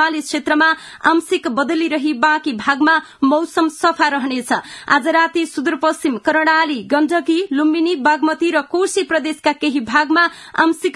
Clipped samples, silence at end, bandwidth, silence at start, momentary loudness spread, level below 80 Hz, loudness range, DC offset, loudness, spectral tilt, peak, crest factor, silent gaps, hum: under 0.1%; 0 s; 12 kHz; 0 s; 5 LU; -62 dBFS; 1 LU; under 0.1%; -16 LUFS; -3 dB/octave; 0 dBFS; 16 dB; none; none